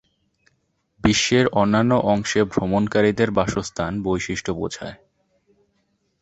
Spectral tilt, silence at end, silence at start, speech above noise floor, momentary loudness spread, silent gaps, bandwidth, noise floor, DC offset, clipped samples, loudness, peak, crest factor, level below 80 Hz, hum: -5 dB/octave; 1.25 s; 1.05 s; 49 dB; 9 LU; none; 8.2 kHz; -69 dBFS; under 0.1%; under 0.1%; -20 LUFS; -4 dBFS; 18 dB; -44 dBFS; none